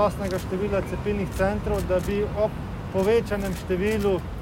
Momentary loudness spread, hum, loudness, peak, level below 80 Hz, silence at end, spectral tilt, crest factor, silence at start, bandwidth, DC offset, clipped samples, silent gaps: 6 LU; none; -26 LUFS; -10 dBFS; -36 dBFS; 0 s; -6.5 dB/octave; 16 dB; 0 s; 16.5 kHz; under 0.1%; under 0.1%; none